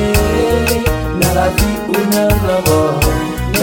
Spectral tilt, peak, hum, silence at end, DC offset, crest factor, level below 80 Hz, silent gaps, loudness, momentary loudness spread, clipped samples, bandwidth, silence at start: -5 dB/octave; 0 dBFS; none; 0 s; under 0.1%; 12 dB; -22 dBFS; none; -14 LUFS; 3 LU; under 0.1%; 17 kHz; 0 s